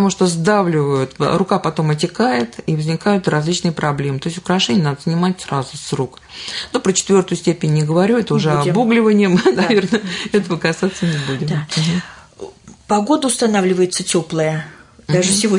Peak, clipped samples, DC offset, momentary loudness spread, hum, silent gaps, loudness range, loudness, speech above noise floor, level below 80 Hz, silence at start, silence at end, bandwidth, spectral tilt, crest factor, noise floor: -2 dBFS; under 0.1%; under 0.1%; 9 LU; none; none; 4 LU; -17 LUFS; 20 dB; -52 dBFS; 0 s; 0 s; 11 kHz; -5 dB/octave; 14 dB; -36 dBFS